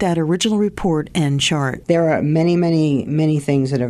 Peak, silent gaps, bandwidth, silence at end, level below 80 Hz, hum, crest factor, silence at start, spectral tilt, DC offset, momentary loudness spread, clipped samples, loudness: -4 dBFS; none; 13 kHz; 0 s; -44 dBFS; none; 14 dB; 0 s; -6 dB/octave; under 0.1%; 3 LU; under 0.1%; -17 LUFS